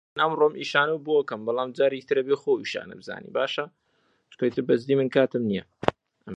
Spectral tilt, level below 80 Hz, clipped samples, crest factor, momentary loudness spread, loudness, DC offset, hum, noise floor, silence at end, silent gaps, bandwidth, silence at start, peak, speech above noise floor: -6 dB/octave; -62 dBFS; under 0.1%; 26 dB; 10 LU; -25 LUFS; under 0.1%; none; -69 dBFS; 0 s; none; 8.2 kHz; 0.15 s; 0 dBFS; 44 dB